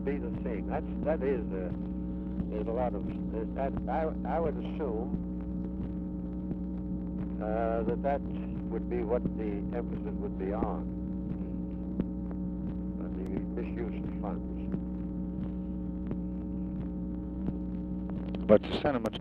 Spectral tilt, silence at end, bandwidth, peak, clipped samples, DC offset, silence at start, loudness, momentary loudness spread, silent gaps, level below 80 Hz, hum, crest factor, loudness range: -9.5 dB/octave; 0 s; 4.8 kHz; -8 dBFS; under 0.1%; under 0.1%; 0 s; -34 LUFS; 6 LU; none; -42 dBFS; none; 26 dB; 3 LU